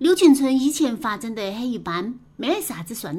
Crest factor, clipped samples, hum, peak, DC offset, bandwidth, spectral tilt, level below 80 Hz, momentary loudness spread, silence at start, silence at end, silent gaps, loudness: 18 dB; under 0.1%; none; -4 dBFS; under 0.1%; 16.5 kHz; -4 dB/octave; -58 dBFS; 14 LU; 0 s; 0 s; none; -22 LUFS